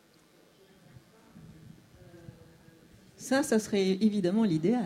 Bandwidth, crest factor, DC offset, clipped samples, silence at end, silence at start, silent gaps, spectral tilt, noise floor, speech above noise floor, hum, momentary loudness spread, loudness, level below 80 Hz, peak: 15.5 kHz; 18 dB; under 0.1%; under 0.1%; 0 s; 1.35 s; none; -5.5 dB/octave; -61 dBFS; 35 dB; none; 25 LU; -28 LUFS; -68 dBFS; -14 dBFS